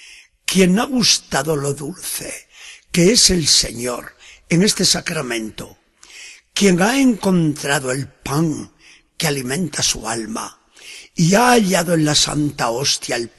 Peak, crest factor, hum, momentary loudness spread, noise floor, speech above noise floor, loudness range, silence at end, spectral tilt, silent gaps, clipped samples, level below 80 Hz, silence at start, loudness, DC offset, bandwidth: 0 dBFS; 18 dB; none; 17 LU; -41 dBFS; 24 dB; 5 LU; 0.1 s; -3.5 dB/octave; none; under 0.1%; -44 dBFS; 0 s; -17 LUFS; under 0.1%; 13 kHz